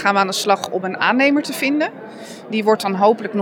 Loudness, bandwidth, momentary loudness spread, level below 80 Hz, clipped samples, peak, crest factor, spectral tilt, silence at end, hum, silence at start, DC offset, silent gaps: -18 LUFS; 20 kHz; 9 LU; -74 dBFS; under 0.1%; -2 dBFS; 16 dB; -4 dB/octave; 0 s; none; 0 s; under 0.1%; none